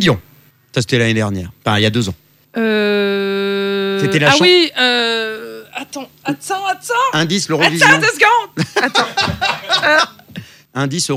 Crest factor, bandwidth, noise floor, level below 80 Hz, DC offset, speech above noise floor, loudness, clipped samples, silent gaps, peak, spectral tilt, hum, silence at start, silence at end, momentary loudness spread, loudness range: 16 dB; 16.5 kHz; -49 dBFS; -52 dBFS; under 0.1%; 34 dB; -14 LUFS; under 0.1%; none; 0 dBFS; -4 dB/octave; none; 0 s; 0 s; 17 LU; 4 LU